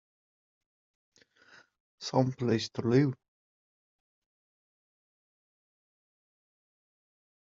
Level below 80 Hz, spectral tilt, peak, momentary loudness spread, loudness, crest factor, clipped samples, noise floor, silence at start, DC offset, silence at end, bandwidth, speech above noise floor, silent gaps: -74 dBFS; -6.5 dB/octave; -12 dBFS; 11 LU; -29 LUFS; 24 dB; under 0.1%; -61 dBFS; 2 s; under 0.1%; 4.3 s; 7.4 kHz; 32 dB; none